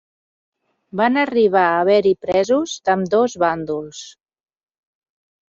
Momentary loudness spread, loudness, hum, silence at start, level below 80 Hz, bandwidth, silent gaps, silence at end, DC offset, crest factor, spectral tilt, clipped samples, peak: 12 LU; -17 LUFS; none; 0.95 s; -60 dBFS; 7.8 kHz; none; 1.4 s; under 0.1%; 16 dB; -5 dB/octave; under 0.1%; -4 dBFS